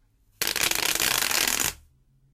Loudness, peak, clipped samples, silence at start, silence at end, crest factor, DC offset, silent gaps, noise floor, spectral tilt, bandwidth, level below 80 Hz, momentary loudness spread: -23 LUFS; -10 dBFS; under 0.1%; 0.4 s; 0.6 s; 18 dB; under 0.1%; none; -61 dBFS; 0.5 dB/octave; 16.5 kHz; -52 dBFS; 6 LU